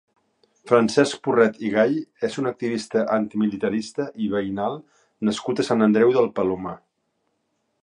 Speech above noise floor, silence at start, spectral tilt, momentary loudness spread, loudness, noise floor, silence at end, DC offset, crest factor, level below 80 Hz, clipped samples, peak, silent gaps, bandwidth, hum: 51 dB; 0.65 s; -5.5 dB/octave; 10 LU; -22 LUFS; -73 dBFS; 1.05 s; under 0.1%; 22 dB; -62 dBFS; under 0.1%; -2 dBFS; none; 10.5 kHz; none